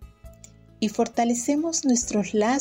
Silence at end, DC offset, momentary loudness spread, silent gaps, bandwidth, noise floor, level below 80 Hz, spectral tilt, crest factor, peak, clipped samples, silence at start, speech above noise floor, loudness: 0 s; under 0.1%; 4 LU; none; 16 kHz; -50 dBFS; -52 dBFS; -3.5 dB/octave; 12 dB; -12 dBFS; under 0.1%; 0 s; 27 dB; -24 LUFS